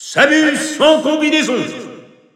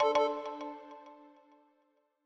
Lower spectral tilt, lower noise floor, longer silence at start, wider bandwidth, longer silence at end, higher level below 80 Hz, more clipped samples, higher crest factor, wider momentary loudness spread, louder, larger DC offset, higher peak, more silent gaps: about the same, -3 dB/octave vs -3 dB/octave; second, -37 dBFS vs -74 dBFS; about the same, 0 s vs 0 s; first, 13.5 kHz vs 8 kHz; second, 0.35 s vs 1 s; first, -62 dBFS vs -82 dBFS; neither; second, 14 dB vs 20 dB; second, 11 LU vs 25 LU; first, -13 LUFS vs -34 LUFS; neither; first, 0 dBFS vs -16 dBFS; neither